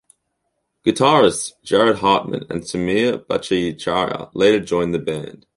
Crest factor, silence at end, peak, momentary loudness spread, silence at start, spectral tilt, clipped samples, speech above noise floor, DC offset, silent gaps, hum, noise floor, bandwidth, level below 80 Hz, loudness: 18 dB; 0.25 s; 0 dBFS; 11 LU; 0.85 s; -4.5 dB/octave; under 0.1%; 55 dB; under 0.1%; none; none; -73 dBFS; 11.5 kHz; -50 dBFS; -18 LUFS